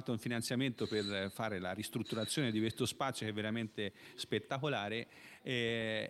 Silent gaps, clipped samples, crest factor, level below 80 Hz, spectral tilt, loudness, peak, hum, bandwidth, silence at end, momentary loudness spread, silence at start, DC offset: none; under 0.1%; 16 dB; -74 dBFS; -4.5 dB/octave; -38 LUFS; -22 dBFS; none; 16 kHz; 0 s; 6 LU; 0 s; under 0.1%